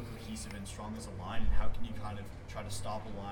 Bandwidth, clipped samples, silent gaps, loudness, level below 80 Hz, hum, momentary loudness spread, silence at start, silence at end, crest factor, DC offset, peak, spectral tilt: 13 kHz; under 0.1%; none; -42 LUFS; -40 dBFS; none; 6 LU; 0 s; 0 s; 16 dB; under 0.1%; -16 dBFS; -5 dB/octave